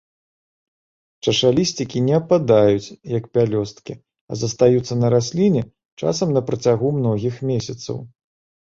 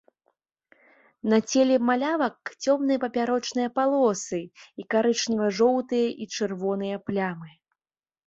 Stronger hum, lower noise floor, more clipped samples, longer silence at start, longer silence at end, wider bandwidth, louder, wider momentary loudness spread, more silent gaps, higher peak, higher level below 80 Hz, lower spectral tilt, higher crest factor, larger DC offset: neither; about the same, under -90 dBFS vs under -90 dBFS; neither; about the same, 1.25 s vs 1.25 s; second, 0.65 s vs 0.8 s; about the same, 7.8 kHz vs 8 kHz; first, -19 LUFS vs -25 LUFS; first, 14 LU vs 9 LU; first, 4.21-4.28 s, 5.85-5.97 s vs none; first, -2 dBFS vs -8 dBFS; first, -52 dBFS vs -70 dBFS; first, -6 dB/octave vs -4.5 dB/octave; about the same, 18 dB vs 18 dB; neither